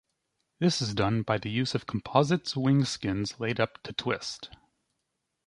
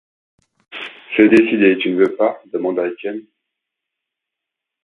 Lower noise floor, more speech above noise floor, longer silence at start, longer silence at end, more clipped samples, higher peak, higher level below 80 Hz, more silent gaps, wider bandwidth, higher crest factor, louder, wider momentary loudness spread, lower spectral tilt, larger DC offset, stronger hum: about the same, -81 dBFS vs -82 dBFS; second, 53 dB vs 67 dB; about the same, 0.6 s vs 0.7 s; second, 1 s vs 1.65 s; neither; second, -6 dBFS vs 0 dBFS; about the same, -58 dBFS vs -62 dBFS; neither; first, 11.5 kHz vs 9.8 kHz; first, 24 dB vs 18 dB; second, -29 LUFS vs -15 LUFS; second, 8 LU vs 19 LU; second, -5.5 dB/octave vs -7 dB/octave; neither; neither